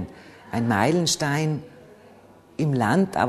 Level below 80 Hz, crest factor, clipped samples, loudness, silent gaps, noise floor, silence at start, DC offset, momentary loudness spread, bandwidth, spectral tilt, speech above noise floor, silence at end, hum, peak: -56 dBFS; 20 dB; under 0.1%; -23 LUFS; none; -51 dBFS; 0 s; under 0.1%; 12 LU; 13.5 kHz; -5 dB/octave; 29 dB; 0 s; none; -4 dBFS